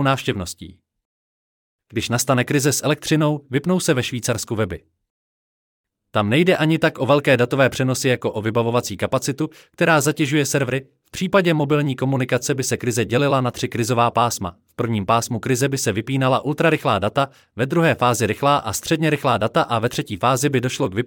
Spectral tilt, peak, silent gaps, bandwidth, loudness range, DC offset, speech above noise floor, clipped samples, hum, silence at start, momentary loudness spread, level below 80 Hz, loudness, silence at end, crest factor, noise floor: -5 dB/octave; -4 dBFS; 1.05-1.79 s, 5.10-5.84 s; 19 kHz; 3 LU; under 0.1%; over 71 dB; under 0.1%; none; 0 s; 8 LU; -56 dBFS; -20 LUFS; 0 s; 16 dB; under -90 dBFS